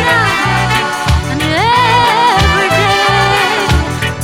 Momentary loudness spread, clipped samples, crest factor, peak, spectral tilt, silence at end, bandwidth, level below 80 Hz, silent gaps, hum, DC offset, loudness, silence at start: 5 LU; under 0.1%; 12 dB; 0 dBFS; -4 dB/octave; 0 s; 17 kHz; -24 dBFS; none; none; under 0.1%; -10 LUFS; 0 s